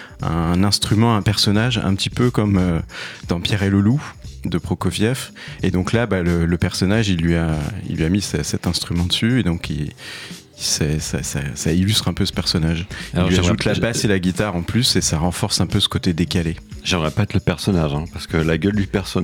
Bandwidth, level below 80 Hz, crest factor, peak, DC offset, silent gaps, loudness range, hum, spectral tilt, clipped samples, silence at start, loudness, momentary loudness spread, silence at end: 17 kHz; -38 dBFS; 16 dB; -2 dBFS; under 0.1%; none; 3 LU; none; -5 dB/octave; under 0.1%; 0 s; -19 LUFS; 9 LU; 0 s